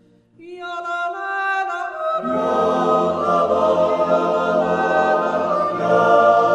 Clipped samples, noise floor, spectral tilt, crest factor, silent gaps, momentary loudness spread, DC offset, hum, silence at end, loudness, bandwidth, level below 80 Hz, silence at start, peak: under 0.1%; -44 dBFS; -6 dB/octave; 18 dB; none; 10 LU; under 0.1%; none; 0 s; -18 LUFS; 9.2 kHz; -62 dBFS; 0.4 s; -2 dBFS